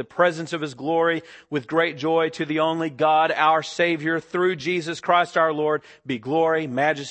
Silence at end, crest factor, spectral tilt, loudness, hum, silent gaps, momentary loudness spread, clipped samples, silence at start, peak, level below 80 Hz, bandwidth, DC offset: 0 s; 18 dB; -5 dB/octave; -22 LUFS; none; none; 9 LU; under 0.1%; 0 s; -4 dBFS; -72 dBFS; 8.6 kHz; under 0.1%